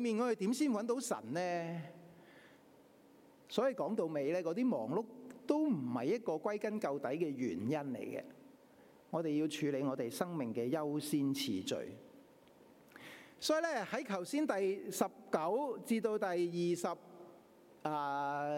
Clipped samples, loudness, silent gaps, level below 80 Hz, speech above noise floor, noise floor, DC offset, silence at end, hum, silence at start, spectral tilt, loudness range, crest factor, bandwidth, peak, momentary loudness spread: under 0.1%; -37 LUFS; none; -88 dBFS; 27 dB; -63 dBFS; under 0.1%; 0 s; none; 0 s; -5 dB/octave; 3 LU; 20 dB; 16.5 kHz; -18 dBFS; 11 LU